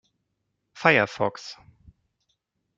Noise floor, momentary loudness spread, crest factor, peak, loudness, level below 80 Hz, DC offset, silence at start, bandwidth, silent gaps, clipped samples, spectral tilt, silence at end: -78 dBFS; 21 LU; 26 dB; -2 dBFS; -22 LUFS; -66 dBFS; under 0.1%; 0.75 s; 7.8 kHz; none; under 0.1%; -5 dB/octave; 1.25 s